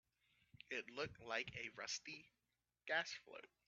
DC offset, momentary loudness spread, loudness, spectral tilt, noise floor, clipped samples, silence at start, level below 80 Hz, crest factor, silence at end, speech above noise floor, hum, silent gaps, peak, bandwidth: under 0.1%; 15 LU; -47 LUFS; -0.5 dB/octave; under -90 dBFS; under 0.1%; 0.7 s; -80 dBFS; 24 dB; 0.2 s; over 41 dB; none; none; -26 dBFS; 7.4 kHz